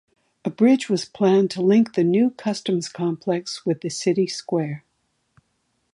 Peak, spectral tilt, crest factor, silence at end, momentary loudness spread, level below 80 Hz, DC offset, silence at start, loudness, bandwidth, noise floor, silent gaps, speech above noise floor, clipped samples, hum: -6 dBFS; -6 dB/octave; 16 dB; 1.15 s; 8 LU; -70 dBFS; under 0.1%; 0.45 s; -21 LUFS; 11.5 kHz; -71 dBFS; none; 50 dB; under 0.1%; none